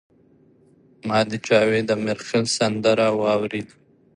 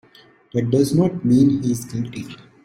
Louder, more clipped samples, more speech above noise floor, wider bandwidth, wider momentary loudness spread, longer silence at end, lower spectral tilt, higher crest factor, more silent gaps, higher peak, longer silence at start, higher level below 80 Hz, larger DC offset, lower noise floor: about the same, -21 LUFS vs -19 LUFS; neither; about the same, 35 dB vs 33 dB; second, 11.5 kHz vs 15.5 kHz; second, 11 LU vs 14 LU; first, 0.5 s vs 0.3 s; second, -4.5 dB/octave vs -7.5 dB/octave; about the same, 18 dB vs 14 dB; neither; about the same, -4 dBFS vs -4 dBFS; first, 1.05 s vs 0.55 s; second, -62 dBFS vs -54 dBFS; neither; first, -56 dBFS vs -51 dBFS